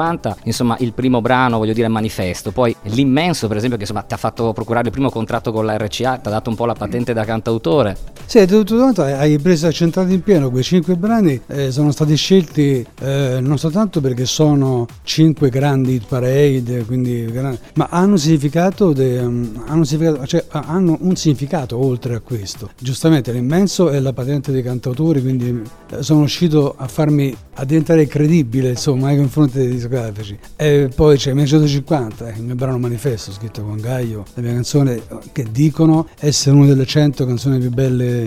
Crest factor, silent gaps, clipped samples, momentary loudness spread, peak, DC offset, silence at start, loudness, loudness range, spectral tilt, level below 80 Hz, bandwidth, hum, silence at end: 16 dB; none; under 0.1%; 9 LU; 0 dBFS; under 0.1%; 0 s; -16 LUFS; 4 LU; -6.5 dB/octave; -40 dBFS; 15.5 kHz; none; 0 s